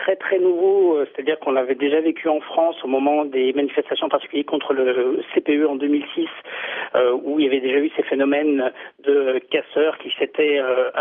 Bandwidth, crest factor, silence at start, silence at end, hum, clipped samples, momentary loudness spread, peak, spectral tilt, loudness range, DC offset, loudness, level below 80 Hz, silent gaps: 3.8 kHz; 14 dB; 0 s; 0 s; none; under 0.1%; 5 LU; -6 dBFS; -7 dB/octave; 2 LU; under 0.1%; -20 LUFS; -80 dBFS; none